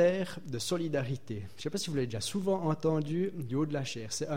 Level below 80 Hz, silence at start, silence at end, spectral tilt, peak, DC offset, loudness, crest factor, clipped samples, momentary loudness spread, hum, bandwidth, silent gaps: -64 dBFS; 0 s; 0 s; -5.5 dB/octave; -16 dBFS; 0.5%; -33 LUFS; 18 dB; under 0.1%; 7 LU; none; 16 kHz; none